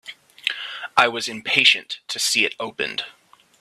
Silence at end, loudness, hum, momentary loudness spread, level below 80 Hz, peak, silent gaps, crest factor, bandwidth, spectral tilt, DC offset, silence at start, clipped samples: 0.5 s; -20 LUFS; none; 15 LU; -70 dBFS; 0 dBFS; none; 24 dB; 15.5 kHz; -0.5 dB/octave; under 0.1%; 0.05 s; under 0.1%